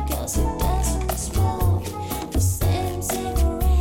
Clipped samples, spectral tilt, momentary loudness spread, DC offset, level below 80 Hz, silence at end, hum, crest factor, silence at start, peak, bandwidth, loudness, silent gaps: under 0.1%; -5.5 dB/octave; 4 LU; under 0.1%; -26 dBFS; 0 s; none; 10 dB; 0 s; -12 dBFS; 17 kHz; -24 LUFS; none